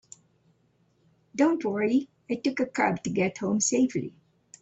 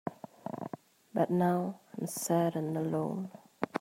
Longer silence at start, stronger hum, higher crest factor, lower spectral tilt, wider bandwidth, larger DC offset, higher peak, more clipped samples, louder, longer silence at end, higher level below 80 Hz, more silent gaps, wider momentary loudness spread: first, 1.35 s vs 0.05 s; neither; about the same, 18 dB vs 22 dB; second, -4.5 dB/octave vs -6.5 dB/octave; second, 8.2 kHz vs 16 kHz; neither; about the same, -10 dBFS vs -12 dBFS; neither; first, -27 LUFS vs -34 LUFS; first, 0.5 s vs 0 s; first, -68 dBFS vs -76 dBFS; neither; second, 10 LU vs 15 LU